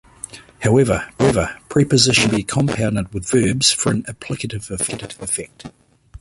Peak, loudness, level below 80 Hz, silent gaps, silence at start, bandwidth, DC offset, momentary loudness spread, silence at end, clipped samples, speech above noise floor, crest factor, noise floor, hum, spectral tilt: 0 dBFS; -18 LUFS; -40 dBFS; none; 0.35 s; 11.5 kHz; under 0.1%; 14 LU; 0.05 s; under 0.1%; 20 dB; 18 dB; -38 dBFS; none; -4 dB/octave